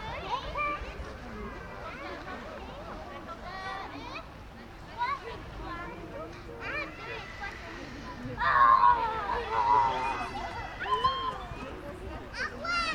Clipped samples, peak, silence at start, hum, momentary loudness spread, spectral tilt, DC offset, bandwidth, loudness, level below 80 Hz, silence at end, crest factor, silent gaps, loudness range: under 0.1%; -12 dBFS; 0 s; none; 17 LU; -4.5 dB/octave; under 0.1%; 13.5 kHz; -31 LUFS; -48 dBFS; 0 s; 20 dB; none; 14 LU